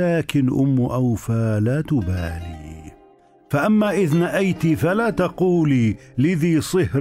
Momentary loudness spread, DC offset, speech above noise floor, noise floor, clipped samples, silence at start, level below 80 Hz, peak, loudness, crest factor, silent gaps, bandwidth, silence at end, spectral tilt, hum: 8 LU; under 0.1%; 33 dB; -52 dBFS; under 0.1%; 0 s; -44 dBFS; -6 dBFS; -20 LUFS; 12 dB; none; 16 kHz; 0 s; -7.5 dB/octave; none